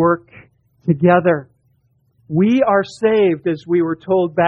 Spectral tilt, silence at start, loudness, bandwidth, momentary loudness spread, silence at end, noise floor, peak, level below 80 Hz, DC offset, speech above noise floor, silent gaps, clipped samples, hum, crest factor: -8.5 dB/octave; 0 s; -16 LUFS; 8.8 kHz; 9 LU; 0 s; -60 dBFS; -2 dBFS; -56 dBFS; under 0.1%; 45 dB; none; under 0.1%; none; 16 dB